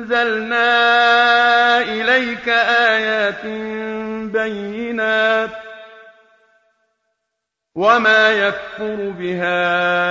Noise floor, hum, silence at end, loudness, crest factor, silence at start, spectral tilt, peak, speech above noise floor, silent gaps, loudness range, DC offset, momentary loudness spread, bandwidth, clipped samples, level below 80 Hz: -78 dBFS; none; 0 s; -16 LUFS; 14 dB; 0 s; -4 dB/octave; -2 dBFS; 62 dB; none; 8 LU; under 0.1%; 13 LU; 7.6 kHz; under 0.1%; -58 dBFS